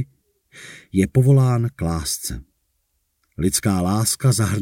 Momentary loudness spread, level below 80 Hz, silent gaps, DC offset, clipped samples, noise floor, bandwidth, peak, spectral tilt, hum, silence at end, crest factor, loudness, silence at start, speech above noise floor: 17 LU; -42 dBFS; none; under 0.1%; under 0.1%; -70 dBFS; 17 kHz; -4 dBFS; -5.5 dB/octave; none; 0 s; 16 dB; -19 LUFS; 0 s; 51 dB